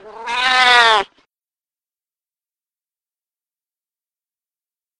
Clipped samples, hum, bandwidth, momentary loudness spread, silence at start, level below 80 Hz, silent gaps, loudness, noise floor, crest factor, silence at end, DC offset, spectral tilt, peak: under 0.1%; none; 14.5 kHz; 14 LU; 0.05 s; -58 dBFS; none; -12 LUFS; under -90 dBFS; 20 dB; 3.95 s; under 0.1%; 0.5 dB/octave; 0 dBFS